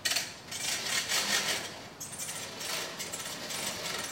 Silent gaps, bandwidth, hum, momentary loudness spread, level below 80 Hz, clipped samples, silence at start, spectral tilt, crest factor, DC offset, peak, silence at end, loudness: none; 16.5 kHz; none; 10 LU; -70 dBFS; under 0.1%; 0 s; 0 dB/octave; 24 dB; under 0.1%; -12 dBFS; 0 s; -32 LUFS